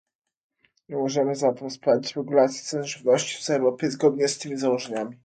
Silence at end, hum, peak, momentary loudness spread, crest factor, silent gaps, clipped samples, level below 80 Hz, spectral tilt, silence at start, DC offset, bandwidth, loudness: 0.1 s; none; -8 dBFS; 7 LU; 18 dB; none; under 0.1%; -72 dBFS; -4.5 dB/octave; 0.9 s; under 0.1%; 9.4 kHz; -24 LUFS